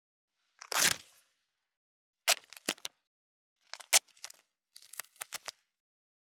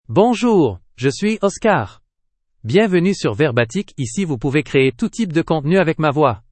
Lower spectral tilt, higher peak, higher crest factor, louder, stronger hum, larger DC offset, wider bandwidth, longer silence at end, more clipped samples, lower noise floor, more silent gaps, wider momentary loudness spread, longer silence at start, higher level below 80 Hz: second, 1 dB/octave vs -6 dB/octave; second, -8 dBFS vs 0 dBFS; first, 30 dB vs 16 dB; second, -31 LUFS vs -17 LUFS; neither; neither; first, over 20 kHz vs 8.8 kHz; first, 0.9 s vs 0.15 s; neither; first, -81 dBFS vs -69 dBFS; first, 1.77-2.13 s, 3.07-3.56 s vs none; first, 22 LU vs 7 LU; first, 0.7 s vs 0.1 s; second, -82 dBFS vs -48 dBFS